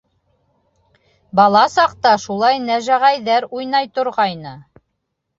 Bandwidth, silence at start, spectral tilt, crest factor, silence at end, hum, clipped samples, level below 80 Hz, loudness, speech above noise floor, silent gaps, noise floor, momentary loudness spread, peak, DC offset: 7.8 kHz; 1.35 s; -4 dB/octave; 16 dB; 0.75 s; none; under 0.1%; -60 dBFS; -16 LUFS; 58 dB; none; -74 dBFS; 8 LU; -2 dBFS; under 0.1%